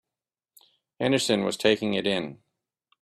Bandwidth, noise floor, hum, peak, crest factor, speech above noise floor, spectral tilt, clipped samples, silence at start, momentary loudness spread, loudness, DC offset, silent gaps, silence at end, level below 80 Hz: 14 kHz; under -90 dBFS; none; -8 dBFS; 22 dB; over 65 dB; -4 dB/octave; under 0.1%; 1 s; 7 LU; -25 LUFS; under 0.1%; none; 0.65 s; -66 dBFS